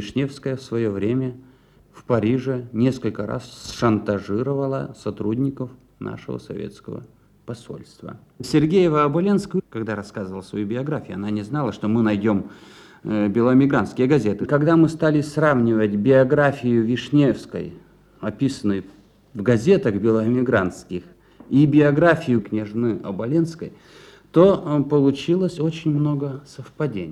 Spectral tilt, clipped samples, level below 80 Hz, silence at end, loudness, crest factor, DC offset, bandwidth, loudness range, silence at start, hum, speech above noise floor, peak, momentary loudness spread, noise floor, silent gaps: -7.5 dB/octave; under 0.1%; -54 dBFS; 0 s; -21 LUFS; 20 dB; under 0.1%; 12 kHz; 7 LU; 0 s; none; 31 dB; -2 dBFS; 17 LU; -51 dBFS; none